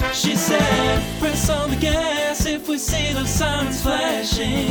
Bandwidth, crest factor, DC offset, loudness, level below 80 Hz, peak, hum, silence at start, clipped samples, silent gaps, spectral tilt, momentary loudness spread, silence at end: over 20 kHz; 16 dB; under 0.1%; -20 LUFS; -30 dBFS; -4 dBFS; none; 0 s; under 0.1%; none; -4 dB/octave; 4 LU; 0 s